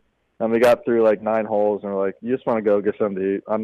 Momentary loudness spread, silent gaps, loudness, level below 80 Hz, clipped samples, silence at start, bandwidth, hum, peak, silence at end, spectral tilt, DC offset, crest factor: 8 LU; none; -21 LUFS; -60 dBFS; under 0.1%; 0.4 s; 13.5 kHz; none; -8 dBFS; 0 s; -7 dB/octave; under 0.1%; 12 dB